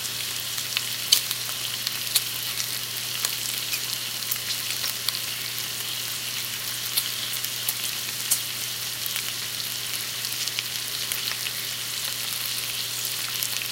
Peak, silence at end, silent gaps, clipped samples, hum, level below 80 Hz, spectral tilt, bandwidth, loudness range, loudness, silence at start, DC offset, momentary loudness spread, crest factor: 0 dBFS; 0 s; none; under 0.1%; 60 Hz at -50 dBFS; -64 dBFS; 0.5 dB/octave; 17.5 kHz; 2 LU; -26 LUFS; 0 s; under 0.1%; 4 LU; 28 dB